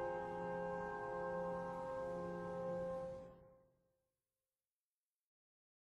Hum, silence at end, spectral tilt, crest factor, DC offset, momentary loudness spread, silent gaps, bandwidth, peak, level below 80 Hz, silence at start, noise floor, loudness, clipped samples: none; 2.35 s; -7.5 dB/octave; 14 dB; under 0.1%; 6 LU; none; 10.5 kHz; -34 dBFS; -70 dBFS; 0 s; under -90 dBFS; -45 LUFS; under 0.1%